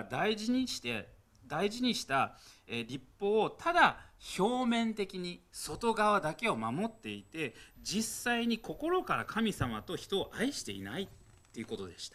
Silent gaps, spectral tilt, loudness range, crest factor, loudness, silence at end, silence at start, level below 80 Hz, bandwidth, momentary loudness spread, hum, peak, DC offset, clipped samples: none; -4 dB/octave; 3 LU; 22 dB; -34 LUFS; 0.05 s; 0 s; -60 dBFS; 15 kHz; 13 LU; none; -12 dBFS; under 0.1%; under 0.1%